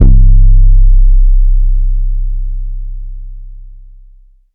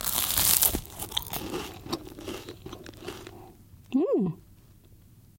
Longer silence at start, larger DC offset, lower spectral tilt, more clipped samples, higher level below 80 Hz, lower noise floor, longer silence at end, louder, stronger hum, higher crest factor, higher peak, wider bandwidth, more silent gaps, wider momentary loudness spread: about the same, 0 s vs 0 s; neither; first, -13.5 dB/octave vs -2.5 dB/octave; neither; first, -8 dBFS vs -48 dBFS; second, -40 dBFS vs -54 dBFS; first, 1 s vs 0.2 s; first, -13 LUFS vs -26 LUFS; neither; second, 8 dB vs 30 dB; about the same, 0 dBFS vs 0 dBFS; second, 0.6 kHz vs 17.5 kHz; neither; about the same, 20 LU vs 22 LU